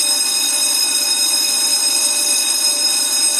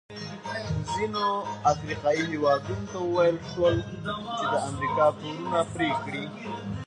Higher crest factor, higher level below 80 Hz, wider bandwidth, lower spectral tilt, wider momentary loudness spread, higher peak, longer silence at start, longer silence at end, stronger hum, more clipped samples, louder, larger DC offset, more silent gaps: about the same, 14 dB vs 18 dB; second, -78 dBFS vs -50 dBFS; first, 16 kHz vs 10.5 kHz; second, 3.5 dB/octave vs -5.5 dB/octave; second, 1 LU vs 10 LU; first, -2 dBFS vs -10 dBFS; about the same, 0 s vs 0.1 s; about the same, 0 s vs 0 s; neither; neither; first, -13 LUFS vs -28 LUFS; neither; neither